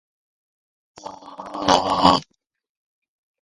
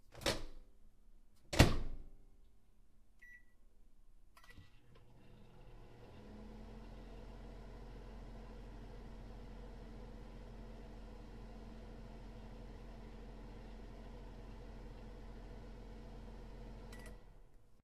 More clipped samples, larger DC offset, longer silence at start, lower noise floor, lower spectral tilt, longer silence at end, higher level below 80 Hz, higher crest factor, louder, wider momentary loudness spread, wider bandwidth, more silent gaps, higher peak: neither; neither; first, 1.05 s vs 0 s; second, -38 dBFS vs -66 dBFS; about the same, -4 dB/octave vs -5 dB/octave; first, 1.2 s vs 0 s; about the same, -50 dBFS vs -50 dBFS; second, 24 dB vs 36 dB; first, -18 LUFS vs -46 LUFS; first, 23 LU vs 18 LU; second, 11.5 kHz vs 14.5 kHz; neither; first, 0 dBFS vs -8 dBFS